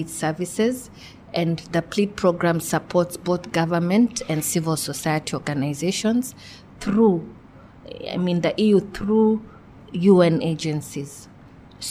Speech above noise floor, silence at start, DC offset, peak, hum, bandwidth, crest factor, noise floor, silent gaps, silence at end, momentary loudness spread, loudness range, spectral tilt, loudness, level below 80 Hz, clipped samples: 24 dB; 0 s; under 0.1%; -4 dBFS; none; 16 kHz; 18 dB; -46 dBFS; none; 0 s; 15 LU; 3 LU; -5.5 dB/octave; -22 LUFS; -52 dBFS; under 0.1%